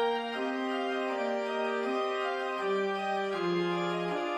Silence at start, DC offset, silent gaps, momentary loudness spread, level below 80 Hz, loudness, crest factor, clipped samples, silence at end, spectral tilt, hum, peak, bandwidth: 0 s; under 0.1%; none; 2 LU; -78 dBFS; -32 LUFS; 12 dB; under 0.1%; 0 s; -5.5 dB/octave; none; -20 dBFS; 10.5 kHz